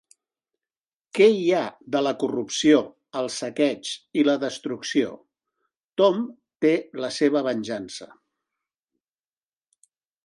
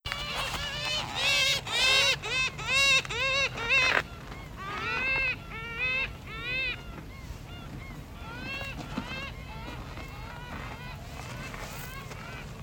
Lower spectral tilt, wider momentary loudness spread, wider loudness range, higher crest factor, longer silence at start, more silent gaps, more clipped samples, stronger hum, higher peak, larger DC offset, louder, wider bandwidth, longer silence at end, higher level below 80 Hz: first, -4.5 dB/octave vs -2 dB/octave; second, 13 LU vs 20 LU; second, 5 LU vs 15 LU; second, 20 dB vs 26 dB; first, 1.15 s vs 0.05 s; first, 5.84-5.90 s vs none; neither; neither; about the same, -6 dBFS vs -6 dBFS; neither; first, -23 LUFS vs -27 LUFS; second, 11.5 kHz vs 19 kHz; first, 2.2 s vs 0 s; second, -72 dBFS vs -46 dBFS